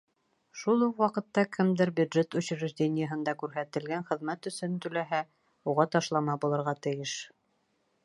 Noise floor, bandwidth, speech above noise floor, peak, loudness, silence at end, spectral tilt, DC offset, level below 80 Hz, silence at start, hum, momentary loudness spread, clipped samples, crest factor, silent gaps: -74 dBFS; 11.5 kHz; 45 dB; -10 dBFS; -30 LUFS; 0.8 s; -6 dB/octave; under 0.1%; -78 dBFS; 0.55 s; none; 9 LU; under 0.1%; 20 dB; none